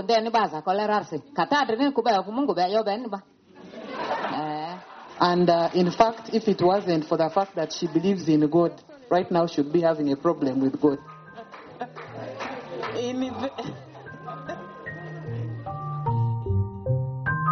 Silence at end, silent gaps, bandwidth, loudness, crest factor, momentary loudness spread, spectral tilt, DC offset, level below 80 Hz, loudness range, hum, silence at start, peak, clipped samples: 0 s; none; 6.6 kHz; -25 LUFS; 20 dB; 16 LU; -5.5 dB/octave; under 0.1%; -58 dBFS; 10 LU; none; 0 s; -4 dBFS; under 0.1%